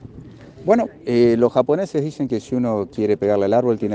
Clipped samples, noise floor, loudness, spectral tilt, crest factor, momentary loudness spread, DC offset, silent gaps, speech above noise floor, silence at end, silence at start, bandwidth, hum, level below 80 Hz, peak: under 0.1%; -40 dBFS; -19 LUFS; -8 dB/octave; 18 dB; 7 LU; under 0.1%; none; 22 dB; 0 s; 0 s; 8.8 kHz; none; -54 dBFS; -2 dBFS